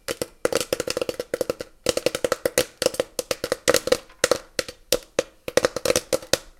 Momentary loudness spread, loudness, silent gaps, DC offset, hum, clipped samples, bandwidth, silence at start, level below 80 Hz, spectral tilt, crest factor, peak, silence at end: 7 LU; -25 LUFS; none; under 0.1%; none; under 0.1%; 17 kHz; 0.1 s; -50 dBFS; -2 dB/octave; 26 dB; 0 dBFS; 0.1 s